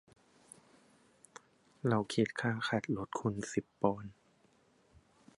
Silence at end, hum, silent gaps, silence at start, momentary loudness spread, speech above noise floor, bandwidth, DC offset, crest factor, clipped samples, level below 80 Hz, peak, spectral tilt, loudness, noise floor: 1.25 s; none; none; 1.85 s; 25 LU; 35 dB; 11.5 kHz; under 0.1%; 24 dB; under 0.1%; -68 dBFS; -14 dBFS; -6 dB/octave; -36 LUFS; -69 dBFS